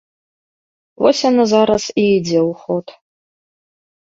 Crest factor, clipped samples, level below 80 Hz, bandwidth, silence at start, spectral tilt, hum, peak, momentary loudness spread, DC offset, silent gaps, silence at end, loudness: 18 dB; under 0.1%; -56 dBFS; 7.8 kHz; 1 s; -5 dB/octave; none; 0 dBFS; 10 LU; under 0.1%; none; 1.25 s; -15 LUFS